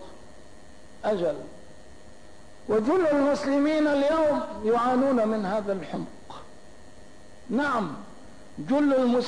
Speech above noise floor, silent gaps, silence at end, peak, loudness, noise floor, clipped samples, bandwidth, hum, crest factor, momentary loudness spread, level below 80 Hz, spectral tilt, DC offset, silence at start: 27 dB; none; 0 s; -14 dBFS; -25 LUFS; -51 dBFS; under 0.1%; 10.5 kHz; none; 12 dB; 19 LU; -56 dBFS; -6 dB/octave; 0.7%; 0 s